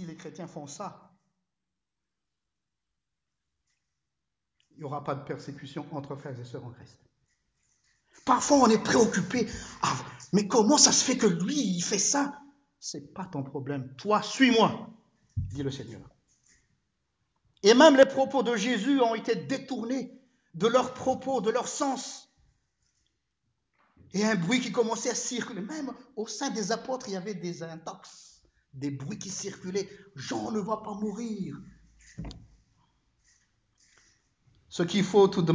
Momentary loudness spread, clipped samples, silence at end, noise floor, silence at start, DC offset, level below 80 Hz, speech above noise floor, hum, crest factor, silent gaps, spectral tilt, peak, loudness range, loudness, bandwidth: 19 LU; under 0.1%; 0 s; -88 dBFS; 0 s; under 0.1%; -58 dBFS; 60 dB; none; 24 dB; none; -3.5 dB/octave; -6 dBFS; 17 LU; -27 LUFS; 8 kHz